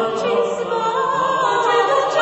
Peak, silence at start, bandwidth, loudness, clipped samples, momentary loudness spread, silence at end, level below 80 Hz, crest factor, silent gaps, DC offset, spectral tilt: -4 dBFS; 0 s; 8.4 kHz; -18 LUFS; under 0.1%; 4 LU; 0 s; -62 dBFS; 14 dB; none; under 0.1%; -3.5 dB/octave